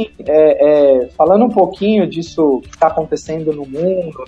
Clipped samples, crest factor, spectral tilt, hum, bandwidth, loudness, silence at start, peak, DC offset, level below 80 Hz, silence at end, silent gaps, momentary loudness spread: under 0.1%; 14 dB; -7 dB/octave; none; 8 kHz; -13 LUFS; 0 s; 0 dBFS; under 0.1%; -46 dBFS; 0 s; none; 10 LU